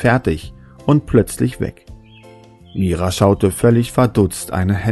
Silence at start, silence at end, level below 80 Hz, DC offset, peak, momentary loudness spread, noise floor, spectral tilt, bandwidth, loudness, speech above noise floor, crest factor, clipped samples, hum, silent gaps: 0 s; 0 s; -36 dBFS; under 0.1%; 0 dBFS; 12 LU; -42 dBFS; -6.5 dB/octave; 12.5 kHz; -17 LUFS; 27 dB; 16 dB; under 0.1%; none; none